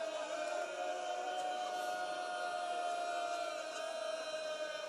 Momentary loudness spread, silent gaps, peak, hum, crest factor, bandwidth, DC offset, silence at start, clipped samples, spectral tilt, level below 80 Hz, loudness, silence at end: 2 LU; none; -28 dBFS; none; 12 dB; 13 kHz; under 0.1%; 0 s; under 0.1%; -0.5 dB/octave; under -90 dBFS; -40 LUFS; 0 s